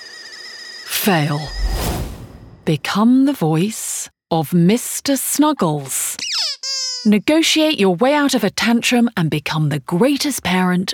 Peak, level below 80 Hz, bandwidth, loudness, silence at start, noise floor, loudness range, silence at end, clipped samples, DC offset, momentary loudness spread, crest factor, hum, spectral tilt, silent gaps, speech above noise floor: -2 dBFS; -34 dBFS; over 20 kHz; -17 LUFS; 0 s; -38 dBFS; 3 LU; 0 s; under 0.1%; under 0.1%; 11 LU; 14 dB; none; -4.5 dB/octave; none; 21 dB